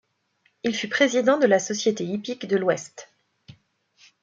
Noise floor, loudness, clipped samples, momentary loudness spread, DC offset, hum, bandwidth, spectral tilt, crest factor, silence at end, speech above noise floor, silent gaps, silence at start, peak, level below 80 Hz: -68 dBFS; -23 LUFS; under 0.1%; 11 LU; under 0.1%; none; 9 kHz; -4 dB/octave; 20 dB; 1.2 s; 45 dB; none; 0.65 s; -4 dBFS; -72 dBFS